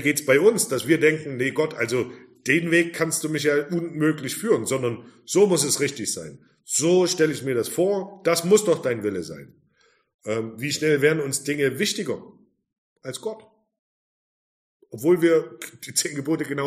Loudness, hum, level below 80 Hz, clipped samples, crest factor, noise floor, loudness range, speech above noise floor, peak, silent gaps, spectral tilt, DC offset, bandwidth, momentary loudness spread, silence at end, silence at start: -22 LUFS; none; -68 dBFS; under 0.1%; 20 dB; -63 dBFS; 5 LU; 41 dB; -4 dBFS; 10.14-10.19 s, 12.78-12.96 s, 13.79-14.80 s; -4 dB/octave; under 0.1%; 15.5 kHz; 14 LU; 0 s; 0 s